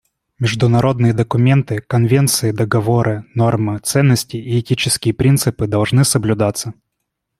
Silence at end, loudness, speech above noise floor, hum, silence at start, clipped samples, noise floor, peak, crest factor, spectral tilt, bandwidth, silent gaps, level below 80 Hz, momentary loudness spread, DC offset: 0.7 s; -16 LUFS; 61 dB; none; 0.4 s; under 0.1%; -75 dBFS; 0 dBFS; 14 dB; -5.5 dB/octave; 15.5 kHz; none; -46 dBFS; 6 LU; under 0.1%